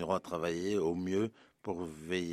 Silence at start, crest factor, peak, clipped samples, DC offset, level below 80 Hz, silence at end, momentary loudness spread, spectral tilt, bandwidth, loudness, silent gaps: 0 s; 18 dB; -16 dBFS; under 0.1%; under 0.1%; -68 dBFS; 0 s; 8 LU; -6 dB/octave; 14.5 kHz; -36 LUFS; none